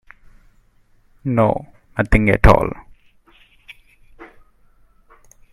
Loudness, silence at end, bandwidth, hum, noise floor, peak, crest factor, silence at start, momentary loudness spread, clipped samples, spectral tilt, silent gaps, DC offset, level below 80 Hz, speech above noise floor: -17 LUFS; 1.25 s; 13.5 kHz; none; -55 dBFS; 0 dBFS; 20 dB; 1.25 s; 17 LU; under 0.1%; -8 dB/octave; none; under 0.1%; -28 dBFS; 40 dB